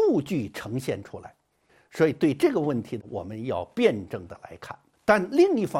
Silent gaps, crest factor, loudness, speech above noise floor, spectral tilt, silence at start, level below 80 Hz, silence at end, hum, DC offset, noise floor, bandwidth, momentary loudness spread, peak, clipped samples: none; 20 dB; -26 LUFS; 38 dB; -6.5 dB/octave; 0 s; -64 dBFS; 0 s; none; under 0.1%; -63 dBFS; 15.5 kHz; 21 LU; -6 dBFS; under 0.1%